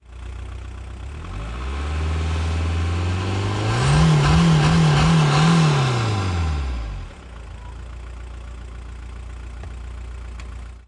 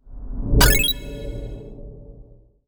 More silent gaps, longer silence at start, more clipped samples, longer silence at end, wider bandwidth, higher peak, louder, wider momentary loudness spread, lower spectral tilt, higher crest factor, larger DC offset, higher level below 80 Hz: neither; about the same, 0.1 s vs 0.05 s; neither; second, 0.05 s vs 0.45 s; second, 11 kHz vs over 20 kHz; second, -6 dBFS vs -2 dBFS; about the same, -19 LUFS vs -18 LUFS; second, 21 LU vs 25 LU; first, -6 dB/octave vs -3 dB/octave; second, 14 dB vs 22 dB; neither; about the same, -30 dBFS vs -26 dBFS